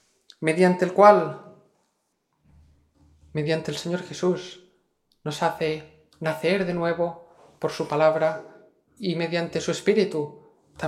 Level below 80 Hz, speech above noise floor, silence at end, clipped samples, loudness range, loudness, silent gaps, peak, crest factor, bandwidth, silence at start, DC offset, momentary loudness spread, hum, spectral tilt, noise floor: -64 dBFS; 51 dB; 0 s; under 0.1%; 8 LU; -24 LUFS; none; -2 dBFS; 24 dB; 14 kHz; 0.4 s; under 0.1%; 14 LU; none; -6 dB/octave; -74 dBFS